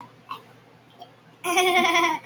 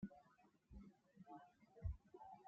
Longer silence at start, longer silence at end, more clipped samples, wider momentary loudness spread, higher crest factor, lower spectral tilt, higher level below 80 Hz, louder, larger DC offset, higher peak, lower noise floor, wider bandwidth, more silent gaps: about the same, 0 s vs 0 s; about the same, 0.05 s vs 0 s; neither; first, 21 LU vs 15 LU; about the same, 18 dB vs 20 dB; second, -1.5 dB/octave vs -9 dB/octave; second, -74 dBFS vs -62 dBFS; first, -21 LUFS vs -59 LUFS; neither; first, -8 dBFS vs -36 dBFS; second, -52 dBFS vs -75 dBFS; first, over 20 kHz vs 7 kHz; neither